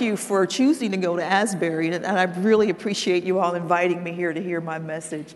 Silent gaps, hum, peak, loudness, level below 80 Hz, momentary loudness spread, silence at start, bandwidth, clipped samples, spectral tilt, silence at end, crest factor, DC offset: none; none; -4 dBFS; -22 LUFS; -70 dBFS; 8 LU; 0 s; 12.5 kHz; under 0.1%; -5 dB/octave; 0 s; 18 dB; under 0.1%